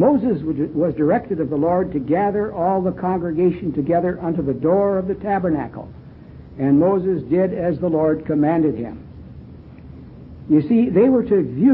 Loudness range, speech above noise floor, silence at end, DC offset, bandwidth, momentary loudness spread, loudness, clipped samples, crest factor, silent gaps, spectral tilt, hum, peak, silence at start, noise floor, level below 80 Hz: 2 LU; 21 dB; 0 s; under 0.1%; 4.5 kHz; 22 LU; -19 LUFS; under 0.1%; 14 dB; none; -13.5 dB/octave; none; -4 dBFS; 0 s; -39 dBFS; -44 dBFS